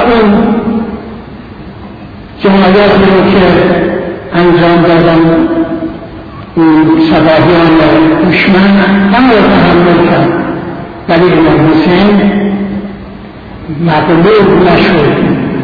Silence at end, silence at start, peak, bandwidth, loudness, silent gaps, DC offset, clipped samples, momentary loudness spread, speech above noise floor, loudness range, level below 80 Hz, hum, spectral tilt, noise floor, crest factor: 0 s; 0 s; 0 dBFS; 5.4 kHz; -7 LUFS; none; under 0.1%; 0.5%; 20 LU; 21 dB; 4 LU; -30 dBFS; none; -9 dB/octave; -26 dBFS; 6 dB